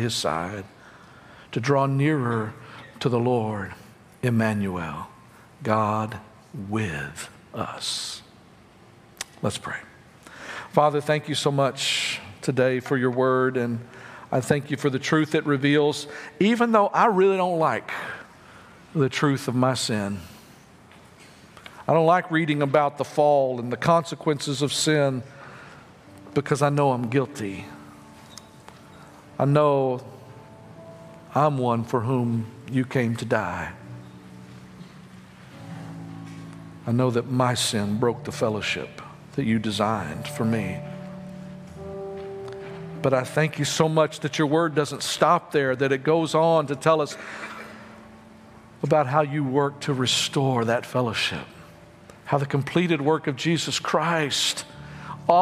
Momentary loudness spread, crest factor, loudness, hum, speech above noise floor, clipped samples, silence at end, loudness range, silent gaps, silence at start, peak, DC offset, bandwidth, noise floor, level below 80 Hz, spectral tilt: 20 LU; 22 dB; -24 LUFS; none; 28 dB; under 0.1%; 0 s; 7 LU; none; 0 s; -4 dBFS; under 0.1%; 15.5 kHz; -51 dBFS; -62 dBFS; -5 dB/octave